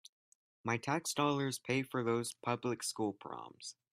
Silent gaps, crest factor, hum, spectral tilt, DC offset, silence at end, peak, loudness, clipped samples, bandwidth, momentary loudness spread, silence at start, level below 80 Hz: none; 20 dB; none; -4.5 dB/octave; under 0.1%; 0.2 s; -18 dBFS; -37 LUFS; under 0.1%; 15.5 kHz; 13 LU; 0.65 s; -78 dBFS